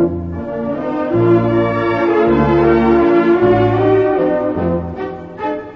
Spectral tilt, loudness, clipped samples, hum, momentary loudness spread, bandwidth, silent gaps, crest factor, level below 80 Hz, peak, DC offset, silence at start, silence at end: -9.5 dB/octave; -14 LUFS; under 0.1%; none; 11 LU; 5.8 kHz; none; 12 dB; -36 dBFS; -2 dBFS; under 0.1%; 0 s; 0 s